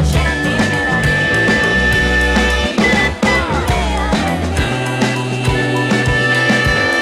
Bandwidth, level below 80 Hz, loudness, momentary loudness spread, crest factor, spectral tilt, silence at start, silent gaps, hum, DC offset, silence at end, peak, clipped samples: 15 kHz; -24 dBFS; -14 LUFS; 4 LU; 10 dB; -5 dB/octave; 0 s; none; none; under 0.1%; 0 s; -4 dBFS; under 0.1%